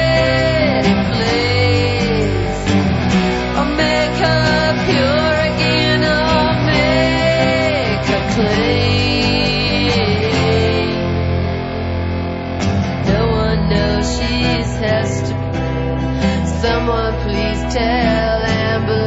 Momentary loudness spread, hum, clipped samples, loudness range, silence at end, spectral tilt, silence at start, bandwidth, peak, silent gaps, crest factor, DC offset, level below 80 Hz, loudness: 6 LU; none; under 0.1%; 4 LU; 0 s; -6 dB/octave; 0 s; 8 kHz; -2 dBFS; none; 14 dB; under 0.1%; -26 dBFS; -15 LUFS